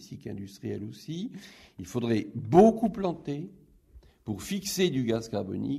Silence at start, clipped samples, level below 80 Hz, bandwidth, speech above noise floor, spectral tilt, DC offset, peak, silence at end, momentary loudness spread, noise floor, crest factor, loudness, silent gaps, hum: 0 s; under 0.1%; -58 dBFS; 15.5 kHz; 28 dB; -6 dB/octave; under 0.1%; -6 dBFS; 0 s; 20 LU; -56 dBFS; 24 dB; -28 LUFS; none; none